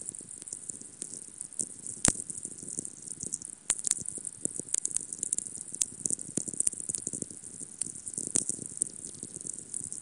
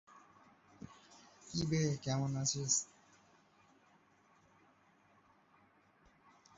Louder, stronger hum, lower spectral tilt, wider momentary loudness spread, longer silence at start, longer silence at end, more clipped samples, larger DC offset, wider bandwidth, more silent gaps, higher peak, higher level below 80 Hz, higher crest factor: first, -33 LUFS vs -36 LUFS; neither; second, -1.5 dB/octave vs -5.5 dB/octave; second, 12 LU vs 24 LU; second, 0 s vs 0.15 s; second, 0 s vs 3.7 s; neither; neither; first, 11.5 kHz vs 8 kHz; neither; first, -2 dBFS vs -18 dBFS; first, -60 dBFS vs -70 dBFS; first, 34 dB vs 24 dB